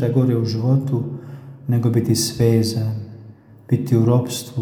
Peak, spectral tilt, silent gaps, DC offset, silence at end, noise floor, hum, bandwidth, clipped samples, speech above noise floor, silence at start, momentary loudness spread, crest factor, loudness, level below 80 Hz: -4 dBFS; -6.5 dB/octave; none; under 0.1%; 0 s; -43 dBFS; none; 19 kHz; under 0.1%; 25 dB; 0 s; 14 LU; 16 dB; -19 LUFS; -52 dBFS